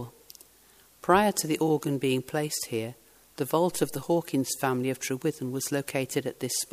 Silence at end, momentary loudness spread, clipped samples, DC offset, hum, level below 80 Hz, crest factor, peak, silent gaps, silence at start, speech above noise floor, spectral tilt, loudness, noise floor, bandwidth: 0.05 s; 8 LU; under 0.1%; under 0.1%; none; -64 dBFS; 22 dB; -6 dBFS; none; 0 s; 31 dB; -4.5 dB/octave; -28 LUFS; -58 dBFS; 15.5 kHz